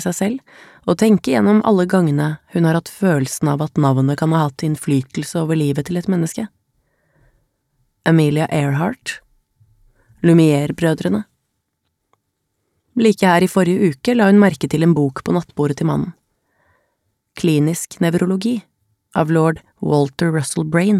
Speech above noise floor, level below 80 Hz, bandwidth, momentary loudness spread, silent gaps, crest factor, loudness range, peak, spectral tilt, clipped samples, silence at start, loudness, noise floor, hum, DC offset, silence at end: 56 dB; -54 dBFS; 15 kHz; 9 LU; none; 16 dB; 5 LU; -2 dBFS; -6.5 dB/octave; under 0.1%; 0 s; -17 LUFS; -72 dBFS; none; under 0.1%; 0 s